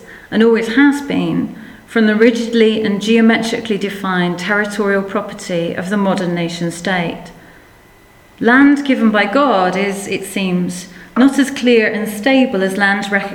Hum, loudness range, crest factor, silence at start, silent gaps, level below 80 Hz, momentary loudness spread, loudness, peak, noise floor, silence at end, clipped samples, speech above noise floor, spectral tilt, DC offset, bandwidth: none; 4 LU; 14 dB; 0 s; none; -52 dBFS; 10 LU; -14 LUFS; 0 dBFS; -45 dBFS; 0 s; under 0.1%; 31 dB; -5.5 dB/octave; under 0.1%; 17.5 kHz